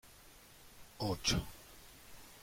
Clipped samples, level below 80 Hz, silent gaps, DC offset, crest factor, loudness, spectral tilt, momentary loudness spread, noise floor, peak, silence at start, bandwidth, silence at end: under 0.1%; -54 dBFS; none; under 0.1%; 24 dB; -37 LUFS; -3.5 dB/octave; 23 LU; -59 dBFS; -18 dBFS; 0.05 s; 16.5 kHz; 0 s